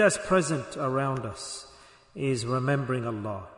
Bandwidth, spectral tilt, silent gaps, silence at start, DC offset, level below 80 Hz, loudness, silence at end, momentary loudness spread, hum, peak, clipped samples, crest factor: 11 kHz; -5 dB/octave; none; 0 s; under 0.1%; -58 dBFS; -28 LUFS; 0 s; 13 LU; none; -10 dBFS; under 0.1%; 18 dB